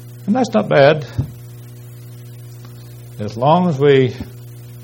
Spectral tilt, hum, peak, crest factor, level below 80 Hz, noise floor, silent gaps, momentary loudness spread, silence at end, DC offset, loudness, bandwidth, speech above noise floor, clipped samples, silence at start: -7 dB/octave; 60 Hz at -35 dBFS; 0 dBFS; 18 dB; -46 dBFS; -35 dBFS; none; 24 LU; 0 s; under 0.1%; -15 LUFS; 17 kHz; 21 dB; under 0.1%; 0 s